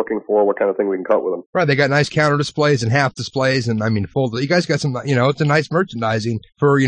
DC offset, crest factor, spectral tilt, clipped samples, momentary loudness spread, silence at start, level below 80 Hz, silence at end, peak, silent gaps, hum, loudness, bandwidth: under 0.1%; 14 dB; -6 dB/octave; under 0.1%; 5 LU; 0 s; -56 dBFS; 0 s; -2 dBFS; 1.46-1.53 s; none; -18 LUFS; 10 kHz